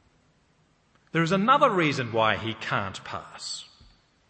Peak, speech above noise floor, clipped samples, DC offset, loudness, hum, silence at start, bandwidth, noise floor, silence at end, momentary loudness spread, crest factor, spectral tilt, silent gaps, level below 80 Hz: -6 dBFS; 40 dB; under 0.1%; under 0.1%; -25 LUFS; none; 1.15 s; 8.8 kHz; -65 dBFS; 0.65 s; 16 LU; 22 dB; -5 dB/octave; none; -64 dBFS